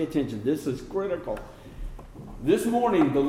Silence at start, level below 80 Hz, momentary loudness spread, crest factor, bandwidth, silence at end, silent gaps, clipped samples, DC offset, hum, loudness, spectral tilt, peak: 0 s; -44 dBFS; 21 LU; 16 dB; 16 kHz; 0 s; none; under 0.1%; under 0.1%; none; -27 LUFS; -6.5 dB/octave; -10 dBFS